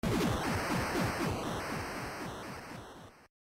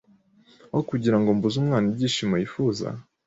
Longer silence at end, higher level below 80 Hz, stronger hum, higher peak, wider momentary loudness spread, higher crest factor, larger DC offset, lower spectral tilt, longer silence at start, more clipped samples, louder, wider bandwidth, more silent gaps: about the same, 0.3 s vs 0.25 s; first, -50 dBFS vs -58 dBFS; neither; second, -24 dBFS vs -8 dBFS; first, 15 LU vs 8 LU; about the same, 12 dB vs 16 dB; neither; second, -5 dB/octave vs -6.5 dB/octave; second, 0.05 s vs 0.75 s; neither; second, -35 LUFS vs -24 LUFS; first, 16 kHz vs 8 kHz; neither